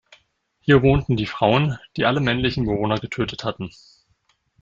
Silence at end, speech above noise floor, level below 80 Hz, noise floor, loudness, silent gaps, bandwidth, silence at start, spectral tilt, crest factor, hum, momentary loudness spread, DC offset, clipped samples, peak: 0.95 s; 46 dB; -42 dBFS; -66 dBFS; -21 LUFS; none; 7.6 kHz; 0.65 s; -7.5 dB/octave; 20 dB; none; 12 LU; under 0.1%; under 0.1%; -2 dBFS